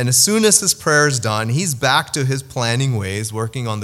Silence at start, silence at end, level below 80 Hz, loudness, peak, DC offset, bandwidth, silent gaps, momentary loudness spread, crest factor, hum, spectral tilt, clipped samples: 0 s; 0 s; -54 dBFS; -16 LUFS; 0 dBFS; under 0.1%; 16 kHz; none; 11 LU; 18 dB; none; -3 dB/octave; under 0.1%